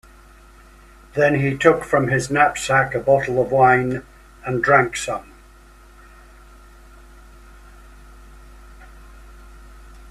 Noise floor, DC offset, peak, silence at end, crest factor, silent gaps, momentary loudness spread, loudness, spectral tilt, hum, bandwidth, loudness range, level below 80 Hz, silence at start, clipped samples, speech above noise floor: -46 dBFS; under 0.1%; 0 dBFS; 0 s; 22 dB; none; 12 LU; -18 LUFS; -5.5 dB/octave; none; 14.5 kHz; 7 LU; -46 dBFS; 1.15 s; under 0.1%; 29 dB